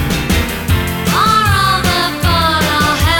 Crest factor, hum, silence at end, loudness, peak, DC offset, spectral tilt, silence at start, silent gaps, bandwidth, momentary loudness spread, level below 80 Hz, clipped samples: 10 dB; none; 0 s; -13 LUFS; -2 dBFS; under 0.1%; -4 dB/octave; 0 s; none; 19.5 kHz; 5 LU; -24 dBFS; under 0.1%